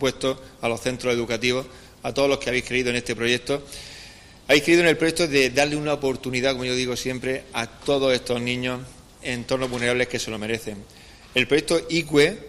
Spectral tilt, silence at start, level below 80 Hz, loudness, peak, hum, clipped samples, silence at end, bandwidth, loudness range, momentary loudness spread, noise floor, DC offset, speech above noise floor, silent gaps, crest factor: -4 dB/octave; 0 s; -48 dBFS; -23 LUFS; -4 dBFS; none; under 0.1%; 0 s; 15.5 kHz; 4 LU; 15 LU; -45 dBFS; under 0.1%; 22 dB; none; 20 dB